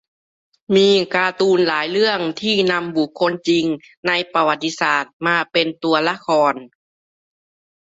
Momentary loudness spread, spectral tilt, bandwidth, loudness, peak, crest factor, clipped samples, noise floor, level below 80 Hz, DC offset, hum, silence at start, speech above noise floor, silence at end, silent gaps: 5 LU; -4.5 dB/octave; 8 kHz; -18 LUFS; -2 dBFS; 16 dB; under 0.1%; under -90 dBFS; -64 dBFS; under 0.1%; none; 0.7 s; over 72 dB; 1.3 s; 3.97-4.03 s, 5.13-5.20 s